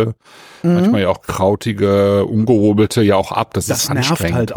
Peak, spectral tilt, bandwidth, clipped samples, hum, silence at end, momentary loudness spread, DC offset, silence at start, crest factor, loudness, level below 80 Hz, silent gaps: -2 dBFS; -5.5 dB/octave; over 20 kHz; under 0.1%; none; 0 s; 6 LU; under 0.1%; 0 s; 14 dB; -15 LUFS; -44 dBFS; none